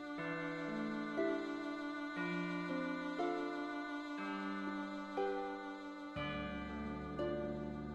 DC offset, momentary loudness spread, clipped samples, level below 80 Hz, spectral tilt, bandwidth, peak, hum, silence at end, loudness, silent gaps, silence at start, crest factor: under 0.1%; 5 LU; under 0.1%; -62 dBFS; -6.5 dB/octave; 9.4 kHz; -26 dBFS; none; 0 s; -42 LUFS; none; 0 s; 16 dB